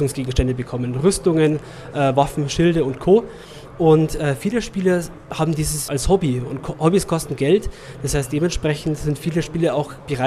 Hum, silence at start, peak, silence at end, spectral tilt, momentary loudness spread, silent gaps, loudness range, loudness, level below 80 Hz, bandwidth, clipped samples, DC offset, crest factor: none; 0 s; -2 dBFS; 0 s; -6 dB/octave; 9 LU; none; 3 LU; -20 LUFS; -34 dBFS; 15 kHz; under 0.1%; under 0.1%; 18 dB